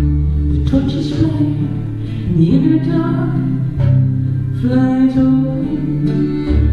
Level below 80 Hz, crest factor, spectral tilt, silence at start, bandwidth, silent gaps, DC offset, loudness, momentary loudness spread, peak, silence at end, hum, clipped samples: -24 dBFS; 12 dB; -9.5 dB/octave; 0 s; 6.8 kHz; none; under 0.1%; -15 LUFS; 6 LU; -2 dBFS; 0 s; none; under 0.1%